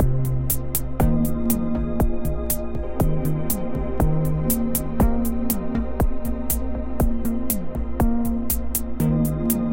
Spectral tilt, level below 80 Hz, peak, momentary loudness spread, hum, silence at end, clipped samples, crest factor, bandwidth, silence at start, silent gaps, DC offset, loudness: -6.5 dB/octave; -26 dBFS; -4 dBFS; 4 LU; none; 0 s; under 0.1%; 16 dB; 17 kHz; 0 s; none; 1%; -24 LUFS